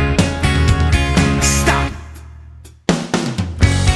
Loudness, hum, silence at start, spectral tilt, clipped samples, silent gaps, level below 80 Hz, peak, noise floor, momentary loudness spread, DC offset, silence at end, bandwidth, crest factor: -16 LUFS; none; 0 s; -4.5 dB/octave; under 0.1%; none; -22 dBFS; 0 dBFS; -38 dBFS; 10 LU; under 0.1%; 0 s; 12 kHz; 16 dB